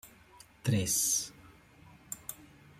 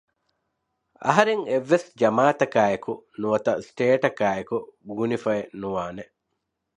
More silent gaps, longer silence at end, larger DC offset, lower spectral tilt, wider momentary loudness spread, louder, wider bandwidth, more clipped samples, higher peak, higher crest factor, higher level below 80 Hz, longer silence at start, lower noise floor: neither; second, 0.35 s vs 0.75 s; neither; second, -3 dB/octave vs -6 dB/octave; first, 18 LU vs 11 LU; second, -31 LUFS vs -23 LUFS; first, 16.5 kHz vs 10.5 kHz; neither; second, -18 dBFS vs 0 dBFS; about the same, 20 dB vs 24 dB; about the same, -64 dBFS vs -64 dBFS; second, 0.05 s vs 1 s; second, -58 dBFS vs -79 dBFS